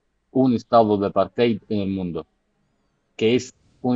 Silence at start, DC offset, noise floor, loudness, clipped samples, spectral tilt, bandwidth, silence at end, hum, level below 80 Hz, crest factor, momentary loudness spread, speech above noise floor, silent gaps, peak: 0.35 s; under 0.1%; -68 dBFS; -21 LUFS; under 0.1%; -7 dB/octave; 8 kHz; 0 s; none; -58 dBFS; 18 dB; 12 LU; 48 dB; none; -4 dBFS